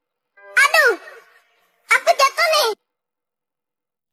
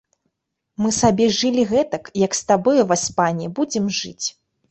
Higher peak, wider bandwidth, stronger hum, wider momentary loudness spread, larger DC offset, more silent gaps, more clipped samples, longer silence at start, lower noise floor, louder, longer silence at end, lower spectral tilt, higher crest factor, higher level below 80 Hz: about the same, -2 dBFS vs -4 dBFS; first, 16 kHz vs 8.6 kHz; neither; about the same, 10 LU vs 9 LU; neither; neither; neither; second, 0.55 s vs 0.8 s; first, -89 dBFS vs -77 dBFS; first, -16 LUFS vs -19 LUFS; first, 1.4 s vs 0.4 s; second, 2.5 dB/octave vs -4 dB/octave; about the same, 18 dB vs 16 dB; second, -78 dBFS vs -50 dBFS